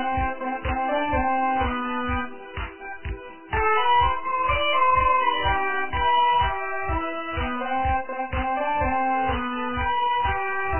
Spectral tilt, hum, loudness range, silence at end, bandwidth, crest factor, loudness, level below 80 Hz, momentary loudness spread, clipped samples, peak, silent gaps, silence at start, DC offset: -8.5 dB/octave; none; 4 LU; 0 s; 3.2 kHz; 14 dB; -23 LUFS; -36 dBFS; 10 LU; under 0.1%; -10 dBFS; none; 0 s; 1%